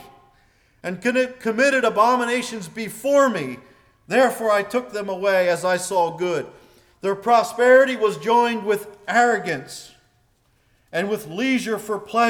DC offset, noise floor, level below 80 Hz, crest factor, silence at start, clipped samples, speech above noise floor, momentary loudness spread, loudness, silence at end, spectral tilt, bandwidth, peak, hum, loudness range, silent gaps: under 0.1%; -62 dBFS; -64 dBFS; 16 dB; 0.85 s; under 0.1%; 42 dB; 12 LU; -20 LUFS; 0 s; -4 dB/octave; 19 kHz; -6 dBFS; none; 4 LU; none